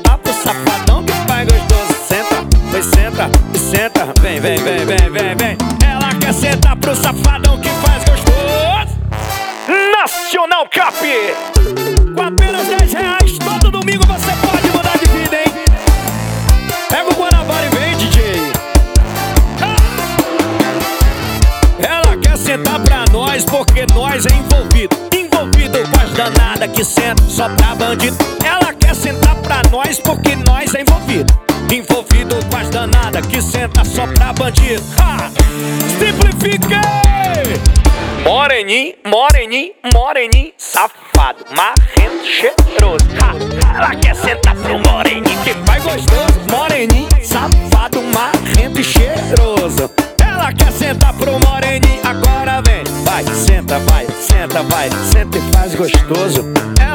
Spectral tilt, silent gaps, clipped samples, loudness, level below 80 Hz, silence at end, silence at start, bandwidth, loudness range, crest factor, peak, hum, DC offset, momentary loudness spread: -4.5 dB/octave; none; 0.4%; -12 LUFS; -14 dBFS; 0 s; 0 s; over 20 kHz; 1 LU; 10 dB; 0 dBFS; none; under 0.1%; 3 LU